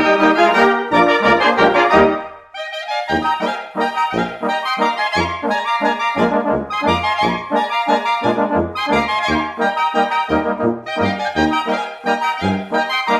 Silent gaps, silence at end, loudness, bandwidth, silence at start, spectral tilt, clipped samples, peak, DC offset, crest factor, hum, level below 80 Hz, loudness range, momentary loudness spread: none; 0 s; -16 LUFS; 14 kHz; 0 s; -5 dB/octave; under 0.1%; 0 dBFS; under 0.1%; 16 dB; none; -44 dBFS; 4 LU; 8 LU